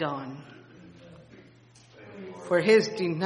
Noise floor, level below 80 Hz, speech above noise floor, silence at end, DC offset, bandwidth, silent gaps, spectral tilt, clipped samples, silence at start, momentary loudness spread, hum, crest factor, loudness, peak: -55 dBFS; -72 dBFS; 30 dB; 0 s; under 0.1%; 10 kHz; none; -5.5 dB/octave; under 0.1%; 0 s; 24 LU; none; 22 dB; -24 LUFS; -8 dBFS